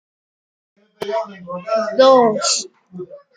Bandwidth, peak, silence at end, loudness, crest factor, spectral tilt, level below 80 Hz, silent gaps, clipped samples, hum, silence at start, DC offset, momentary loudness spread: 9.6 kHz; -2 dBFS; 0.2 s; -16 LUFS; 18 dB; -2.5 dB/octave; -68 dBFS; none; under 0.1%; none; 1 s; under 0.1%; 24 LU